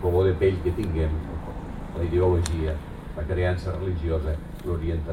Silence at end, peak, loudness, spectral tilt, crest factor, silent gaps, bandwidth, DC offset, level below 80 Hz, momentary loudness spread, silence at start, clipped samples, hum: 0 s; -10 dBFS; -27 LUFS; -7.5 dB/octave; 16 dB; none; 12 kHz; under 0.1%; -32 dBFS; 13 LU; 0 s; under 0.1%; none